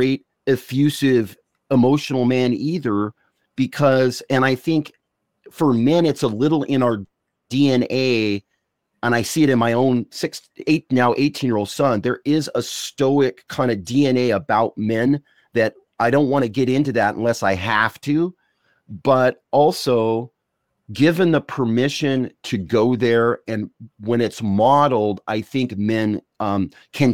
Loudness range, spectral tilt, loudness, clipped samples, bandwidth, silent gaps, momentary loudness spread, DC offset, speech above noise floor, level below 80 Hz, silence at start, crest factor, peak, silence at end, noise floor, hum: 1 LU; -6 dB/octave; -19 LUFS; under 0.1%; 16.5 kHz; none; 9 LU; 0.2%; 56 dB; -58 dBFS; 0 s; 16 dB; -2 dBFS; 0 s; -74 dBFS; none